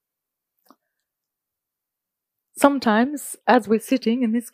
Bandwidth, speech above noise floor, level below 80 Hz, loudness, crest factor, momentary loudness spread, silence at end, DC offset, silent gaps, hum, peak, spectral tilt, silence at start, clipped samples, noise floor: 15.5 kHz; 65 dB; -68 dBFS; -20 LUFS; 22 dB; 5 LU; 0.05 s; under 0.1%; none; none; 0 dBFS; -4.5 dB/octave; 2.55 s; under 0.1%; -85 dBFS